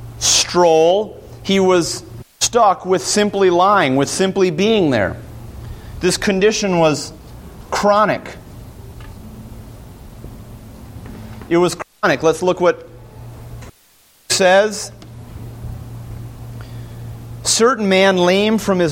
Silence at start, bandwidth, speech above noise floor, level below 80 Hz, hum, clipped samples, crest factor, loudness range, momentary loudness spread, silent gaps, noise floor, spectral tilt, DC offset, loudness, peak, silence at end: 0 s; 16.5 kHz; 37 dB; -42 dBFS; none; under 0.1%; 16 dB; 7 LU; 24 LU; none; -52 dBFS; -3.5 dB/octave; under 0.1%; -15 LUFS; -2 dBFS; 0 s